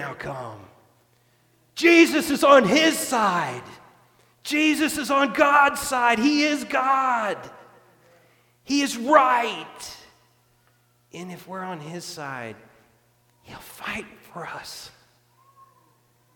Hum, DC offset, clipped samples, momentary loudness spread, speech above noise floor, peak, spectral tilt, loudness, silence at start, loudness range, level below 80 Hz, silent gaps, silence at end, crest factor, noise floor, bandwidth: none; under 0.1%; under 0.1%; 22 LU; 41 dB; -2 dBFS; -3.5 dB/octave; -20 LUFS; 0 s; 18 LU; -62 dBFS; none; 1.45 s; 22 dB; -63 dBFS; 18.5 kHz